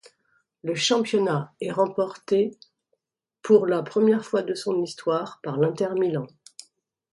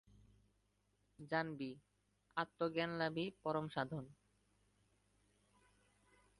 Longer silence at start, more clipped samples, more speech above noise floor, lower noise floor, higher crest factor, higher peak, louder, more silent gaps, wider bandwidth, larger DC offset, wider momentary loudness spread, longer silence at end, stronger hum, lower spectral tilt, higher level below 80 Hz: second, 0.65 s vs 1.2 s; neither; first, 59 dB vs 38 dB; about the same, -82 dBFS vs -80 dBFS; about the same, 20 dB vs 22 dB; first, -6 dBFS vs -24 dBFS; first, -24 LUFS vs -43 LUFS; neither; about the same, 11.5 kHz vs 11 kHz; neither; about the same, 10 LU vs 11 LU; second, 0.85 s vs 2.25 s; neither; second, -5 dB/octave vs -7 dB/octave; first, -72 dBFS vs -78 dBFS